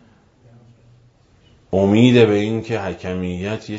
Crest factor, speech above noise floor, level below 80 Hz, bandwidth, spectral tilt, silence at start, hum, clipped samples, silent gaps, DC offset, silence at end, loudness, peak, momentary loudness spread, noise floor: 18 dB; 36 dB; -52 dBFS; 7.8 kHz; -7 dB/octave; 1.75 s; none; under 0.1%; none; under 0.1%; 0 s; -17 LUFS; -2 dBFS; 13 LU; -53 dBFS